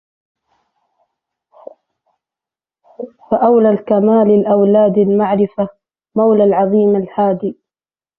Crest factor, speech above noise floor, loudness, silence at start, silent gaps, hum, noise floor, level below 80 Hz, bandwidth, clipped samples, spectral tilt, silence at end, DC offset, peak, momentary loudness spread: 14 dB; over 78 dB; -13 LUFS; 3 s; none; none; under -90 dBFS; -58 dBFS; 3.4 kHz; under 0.1%; -12.5 dB/octave; 0.65 s; under 0.1%; -2 dBFS; 12 LU